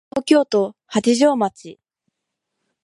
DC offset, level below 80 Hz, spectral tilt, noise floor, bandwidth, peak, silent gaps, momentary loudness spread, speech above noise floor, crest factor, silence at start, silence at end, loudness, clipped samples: under 0.1%; -66 dBFS; -4.5 dB/octave; -79 dBFS; 11.5 kHz; -2 dBFS; none; 7 LU; 62 dB; 18 dB; 0.15 s; 1.1 s; -18 LUFS; under 0.1%